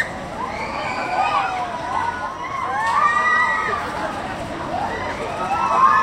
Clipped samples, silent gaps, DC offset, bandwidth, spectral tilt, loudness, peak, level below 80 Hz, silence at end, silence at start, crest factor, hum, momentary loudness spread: under 0.1%; none; under 0.1%; 15.5 kHz; -4 dB/octave; -21 LUFS; -2 dBFS; -46 dBFS; 0 s; 0 s; 18 dB; none; 11 LU